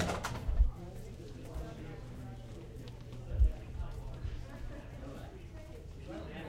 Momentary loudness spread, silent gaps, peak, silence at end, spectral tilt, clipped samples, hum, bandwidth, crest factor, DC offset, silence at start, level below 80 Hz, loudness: 14 LU; none; -16 dBFS; 0 s; -6 dB/octave; under 0.1%; none; 14 kHz; 22 dB; under 0.1%; 0 s; -38 dBFS; -42 LUFS